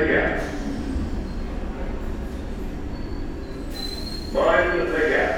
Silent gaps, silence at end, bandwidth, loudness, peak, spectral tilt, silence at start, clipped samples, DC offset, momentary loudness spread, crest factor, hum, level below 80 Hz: none; 0 s; 17 kHz; -26 LUFS; -6 dBFS; -6 dB/octave; 0 s; under 0.1%; under 0.1%; 13 LU; 18 dB; none; -32 dBFS